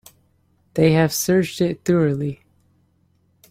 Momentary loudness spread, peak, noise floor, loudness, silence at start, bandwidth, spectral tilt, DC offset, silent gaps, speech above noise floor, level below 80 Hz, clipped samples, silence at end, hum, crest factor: 13 LU; -4 dBFS; -62 dBFS; -19 LUFS; 0.75 s; 16.5 kHz; -5.5 dB/octave; under 0.1%; none; 44 dB; -54 dBFS; under 0.1%; 1.15 s; none; 18 dB